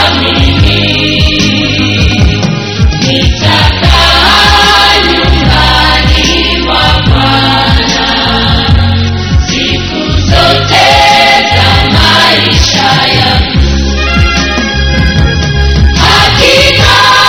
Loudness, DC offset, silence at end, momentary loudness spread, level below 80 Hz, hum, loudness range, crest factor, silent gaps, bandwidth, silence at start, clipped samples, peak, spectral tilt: -6 LUFS; 1%; 0 s; 6 LU; -14 dBFS; none; 3 LU; 6 dB; none; 17 kHz; 0 s; 4%; 0 dBFS; -4 dB/octave